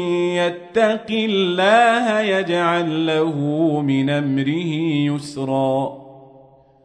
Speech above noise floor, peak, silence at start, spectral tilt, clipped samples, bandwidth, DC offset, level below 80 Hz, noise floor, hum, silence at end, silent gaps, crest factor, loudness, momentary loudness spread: 30 dB; -4 dBFS; 0 s; -6 dB/octave; under 0.1%; 10.5 kHz; under 0.1%; -64 dBFS; -49 dBFS; none; 0.6 s; none; 16 dB; -19 LUFS; 7 LU